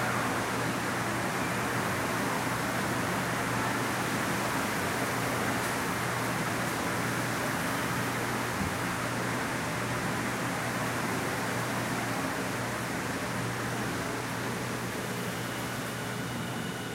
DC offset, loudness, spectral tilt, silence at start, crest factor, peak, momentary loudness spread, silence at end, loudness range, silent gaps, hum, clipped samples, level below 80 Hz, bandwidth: under 0.1%; -31 LUFS; -4 dB/octave; 0 s; 14 dB; -16 dBFS; 4 LU; 0 s; 3 LU; none; none; under 0.1%; -56 dBFS; 16 kHz